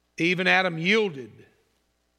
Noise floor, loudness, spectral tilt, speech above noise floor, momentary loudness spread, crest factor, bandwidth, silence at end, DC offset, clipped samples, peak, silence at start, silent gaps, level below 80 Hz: -71 dBFS; -22 LUFS; -5 dB/octave; 47 dB; 10 LU; 22 dB; 13 kHz; 0.9 s; under 0.1%; under 0.1%; -4 dBFS; 0.2 s; none; -76 dBFS